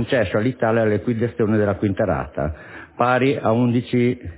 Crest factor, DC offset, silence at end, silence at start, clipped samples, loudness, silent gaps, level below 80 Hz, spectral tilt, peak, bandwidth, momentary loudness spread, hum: 16 dB; under 0.1%; 0 s; 0 s; under 0.1%; -20 LUFS; none; -42 dBFS; -11.5 dB/octave; -2 dBFS; 4 kHz; 8 LU; none